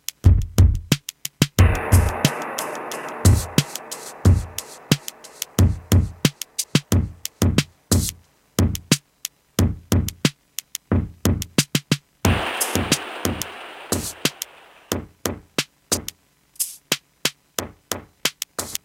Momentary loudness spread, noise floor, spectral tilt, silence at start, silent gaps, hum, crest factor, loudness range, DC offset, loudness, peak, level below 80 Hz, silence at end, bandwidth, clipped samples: 13 LU; -54 dBFS; -4.5 dB/octave; 0.25 s; none; none; 22 dB; 6 LU; under 0.1%; -22 LUFS; 0 dBFS; -30 dBFS; 0.1 s; 17 kHz; under 0.1%